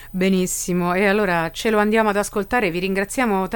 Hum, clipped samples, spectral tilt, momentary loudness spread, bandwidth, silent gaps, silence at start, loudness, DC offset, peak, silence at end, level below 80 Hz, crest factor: none; under 0.1%; -4.5 dB/octave; 4 LU; 17 kHz; none; 0 s; -20 LUFS; under 0.1%; -6 dBFS; 0 s; -44 dBFS; 14 dB